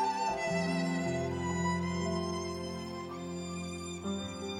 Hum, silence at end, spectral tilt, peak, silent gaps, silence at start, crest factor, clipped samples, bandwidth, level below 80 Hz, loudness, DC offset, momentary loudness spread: none; 0 s; -5.5 dB/octave; -20 dBFS; none; 0 s; 14 dB; under 0.1%; 12 kHz; -58 dBFS; -35 LUFS; under 0.1%; 8 LU